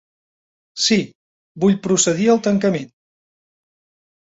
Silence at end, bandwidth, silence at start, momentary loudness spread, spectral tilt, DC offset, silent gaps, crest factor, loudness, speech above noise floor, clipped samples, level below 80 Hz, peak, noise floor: 1.4 s; 8 kHz; 0.75 s; 17 LU; -4 dB/octave; under 0.1%; 1.15-1.55 s; 18 dB; -17 LUFS; over 73 dB; under 0.1%; -60 dBFS; -2 dBFS; under -90 dBFS